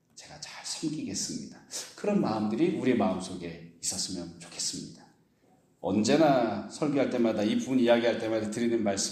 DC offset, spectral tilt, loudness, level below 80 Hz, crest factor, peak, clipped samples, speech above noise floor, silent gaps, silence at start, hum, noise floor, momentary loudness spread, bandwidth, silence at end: under 0.1%; -4.5 dB/octave; -29 LUFS; -68 dBFS; 20 dB; -10 dBFS; under 0.1%; 37 dB; none; 0.15 s; none; -65 dBFS; 16 LU; 14.5 kHz; 0 s